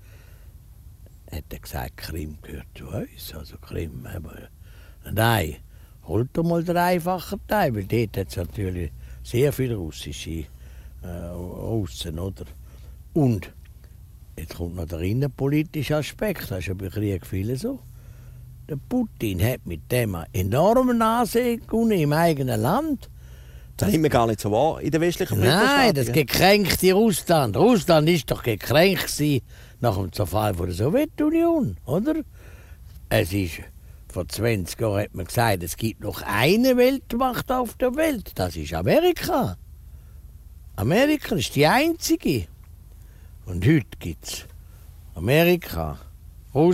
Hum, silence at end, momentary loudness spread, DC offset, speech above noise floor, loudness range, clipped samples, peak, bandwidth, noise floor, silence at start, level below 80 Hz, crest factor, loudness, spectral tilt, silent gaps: none; 0 s; 17 LU; under 0.1%; 23 dB; 10 LU; under 0.1%; -2 dBFS; 16 kHz; -45 dBFS; 0.15 s; -42 dBFS; 20 dB; -23 LUFS; -5.5 dB/octave; none